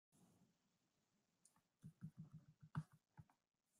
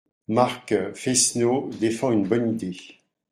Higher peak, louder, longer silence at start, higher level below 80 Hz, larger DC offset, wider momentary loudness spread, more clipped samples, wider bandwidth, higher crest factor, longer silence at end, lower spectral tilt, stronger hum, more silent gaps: second, -36 dBFS vs -4 dBFS; second, -59 LUFS vs -23 LUFS; second, 0.15 s vs 0.3 s; second, -86 dBFS vs -64 dBFS; neither; first, 13 LU vs 8 LU; neither; second, 11.5 kHz vs 16 kHz; first, 26 dB vs 20 dB; about the same, 0.5 s vs 0.45 s; first, -7 dB/octave vs -4 dB/octave; neither; neither